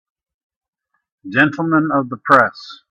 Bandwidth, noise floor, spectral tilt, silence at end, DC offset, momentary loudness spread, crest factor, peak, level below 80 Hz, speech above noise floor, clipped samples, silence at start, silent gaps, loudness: 8.6 kHz; -73 dBFS; -7 dB/octave; 0.15 s; under 0.1%; 8 LU; 18 dB; 0 dBFS; -60 dBFS; 57 dB; under 0.1%; 1.25 s; none; -15 LUFS